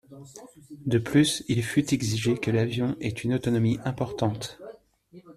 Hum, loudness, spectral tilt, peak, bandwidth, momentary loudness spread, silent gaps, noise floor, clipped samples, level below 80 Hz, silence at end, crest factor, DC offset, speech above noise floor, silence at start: none; -26 LUFS; -5.5 dB/octave; -8 dBFS; 14 kHz; 22 LU; none; -53 dBFS; under 0.1%; -56 dBFS; 0.05 s; 18 dB; under 0.1%; 27 dB; 0.1 s